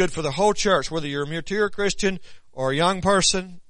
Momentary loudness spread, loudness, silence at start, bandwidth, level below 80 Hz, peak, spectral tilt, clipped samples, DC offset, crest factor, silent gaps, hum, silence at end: 9 LU; -22 LUFS; 0 s; 10.5 kHz; -42 dBFS; -6 dBFS; -3.5 dB/octave; under 0.1%; under 0.1%; 16 dB; none; none; 0.1 s